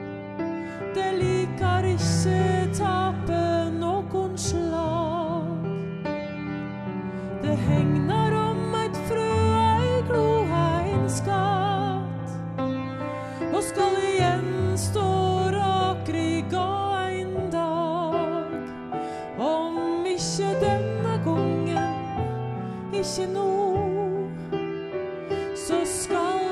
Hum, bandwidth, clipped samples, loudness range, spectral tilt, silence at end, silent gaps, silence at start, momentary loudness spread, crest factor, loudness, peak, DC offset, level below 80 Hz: none; 13.5 kHz; under 0.1%; 4 LU; -6 dB/octave; 0 s; none; 0 s; 9 LU; 16 dB; -26 LUFS; -10 dBFS; under 0.1%; -48 dBFS